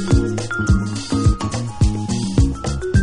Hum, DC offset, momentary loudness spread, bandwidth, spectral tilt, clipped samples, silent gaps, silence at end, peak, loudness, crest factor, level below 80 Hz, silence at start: none; under 0.1%; 4 LU; 11 kHz; -6 dB/octave; under 0.1%; none; 0 s; -2 dBFS; -20 LUFS; 14 dB; -24 dBFS; 0 s